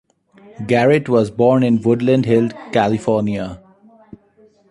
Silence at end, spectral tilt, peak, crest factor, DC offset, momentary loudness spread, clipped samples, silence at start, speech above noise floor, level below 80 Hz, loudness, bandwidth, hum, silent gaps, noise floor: 1.15 s; -7.5 dB/octave; -2 dBFS; 16 dB; under 0.1%; 8 LU; under 0.1%; 0.6 s; 37 dB; -52 dBFS; -16 LUFS; 11 kHz; none; none; -52 dBFS